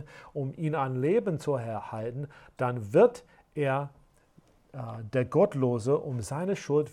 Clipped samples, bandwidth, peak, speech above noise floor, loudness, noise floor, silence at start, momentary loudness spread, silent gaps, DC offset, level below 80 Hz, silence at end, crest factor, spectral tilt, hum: under 0.1%; 13 kHz; -10 dBFS; 33 dB; -29 LUFS; -62 dBFS; 0 s; 15 LU; none; under 0.1%; -64 dBFS; 0 s; 18 dB; -7.5 dB/octave; none